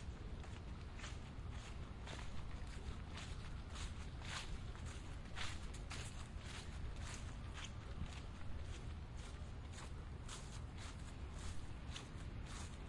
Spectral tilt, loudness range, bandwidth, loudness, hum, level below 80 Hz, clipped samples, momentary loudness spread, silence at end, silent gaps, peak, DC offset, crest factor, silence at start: -4.5 dB/octave; 2 LU; 11.5 kHz; -51 LUFS; none; -52 dBFS; under 0.1%; 4 LU; 0 s; none; -32 dBFS; under 0.1%; 16 dB; 0 s